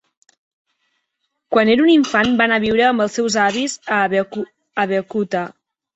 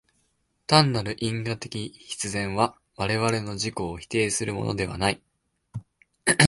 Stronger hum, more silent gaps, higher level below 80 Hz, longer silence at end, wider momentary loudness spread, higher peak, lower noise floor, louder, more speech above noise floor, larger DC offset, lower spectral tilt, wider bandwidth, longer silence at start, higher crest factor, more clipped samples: neither; neither; about the same, -56 dBFS vs -52 dBFS; first, 0.45 s vs 0 s; second, 11 LU vs 16 LU; about the same, -2 dBFS vs -2 dBFS; about the same, -74 dBFS vs -71 dBFS; first, -17 LUFS vs -26 LUFS; first, 57 dB vs 45 dB; neither; about the same, -4 dB/octave vs -4 dB/octave; second, 8.2 kHz vs 11.5 kHz; first, 1.5 s vs 0.7 s; second, 16 dB vs 26 dB; neither